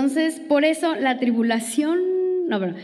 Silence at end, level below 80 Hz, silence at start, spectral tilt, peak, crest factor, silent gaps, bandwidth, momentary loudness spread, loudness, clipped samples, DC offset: 0 s; -76 dBFS; 0 s; -4.5 dB/octave; -6 dBFS; 14 dB; none; 13.5 kHz; 3 LU; -21 LUFS; under 0.1%; under 0.1%